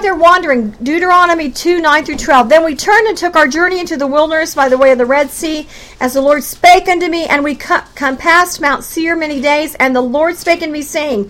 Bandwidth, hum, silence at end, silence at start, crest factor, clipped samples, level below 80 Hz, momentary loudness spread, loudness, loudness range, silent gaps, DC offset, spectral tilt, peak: 17 kHz; none; 0 s; 0 s; 12 dB; 0.3%; -40 dBFS; 8 LU; -11 LUFS; 2 LU; none; under 0.1%; -3 dB/octave; 0 dBFS